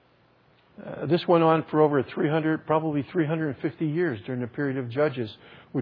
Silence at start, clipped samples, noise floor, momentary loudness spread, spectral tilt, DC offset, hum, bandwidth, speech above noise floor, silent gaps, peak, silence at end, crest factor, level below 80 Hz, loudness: 0.8 s; under 0.1%; -61 dBFS; 13 LU; -10.5 dB/octave; under 0.1%; none; 5 kHz; 36 dB; none; -8 dBFS; 0 s; 18 dB; -70 dBFS; -25 LUFS